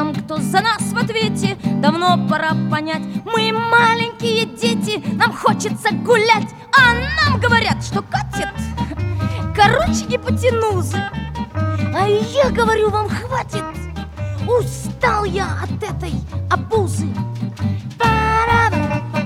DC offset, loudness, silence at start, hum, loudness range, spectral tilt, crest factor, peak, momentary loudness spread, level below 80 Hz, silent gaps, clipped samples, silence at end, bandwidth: under 0.1%; -17 LUFS; 0 s; none; 5 LU; -5 dB/octave; 16 dB; 0 dBFS; 11 LU; -34 dBFS; none; under 0.1%; 0 s; 16 kHz